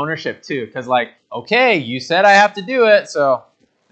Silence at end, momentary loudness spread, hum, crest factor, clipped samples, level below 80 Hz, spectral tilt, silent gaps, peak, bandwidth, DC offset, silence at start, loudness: 0.5 s; 14 LU; none; 16 dB; under 0.1%; -70 dBFS; -4 dB/octave; none; 0 dBFS; 8.8 kHz; under 0.1%; 0 s; -15 LUFS